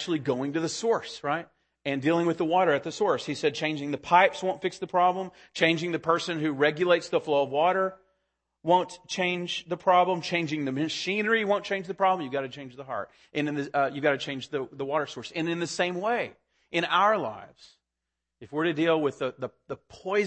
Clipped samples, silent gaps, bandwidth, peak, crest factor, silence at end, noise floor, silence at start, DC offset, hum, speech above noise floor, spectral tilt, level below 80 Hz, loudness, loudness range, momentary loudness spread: under 0.1%; none; 8.8 kHz; -6 dBFS; 22 dB; 0 s; -85 dBFS; 0 s; under 0.1%; none; 58 dB; -5 dB/octave; -72 dBFS; -27 LUFS; 4 LU; 12 LU